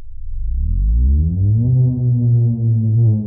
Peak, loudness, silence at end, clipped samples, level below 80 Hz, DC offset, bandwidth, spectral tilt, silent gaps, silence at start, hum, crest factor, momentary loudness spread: -6 dBFS; -16 LUFS; 0 s; under 0.1%; -20 dBFS; under 0.1%; 0.9 kHz; -18 dB/octave; none; 0 s; none; 8 dB; 10 LU